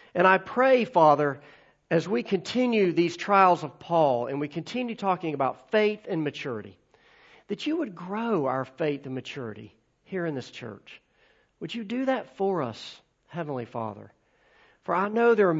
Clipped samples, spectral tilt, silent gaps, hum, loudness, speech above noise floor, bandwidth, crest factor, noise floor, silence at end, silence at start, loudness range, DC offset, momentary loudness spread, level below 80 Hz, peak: under 0.1%; -6.5 dB/octave; none; none; -26 LUFS; 39 dB; 8 kHz; 22 dB; -64 dBFS; 0 s; 0.15 s; 9 LU; under 0.1%; 17 LU; -72 dBFS; -6 dBFS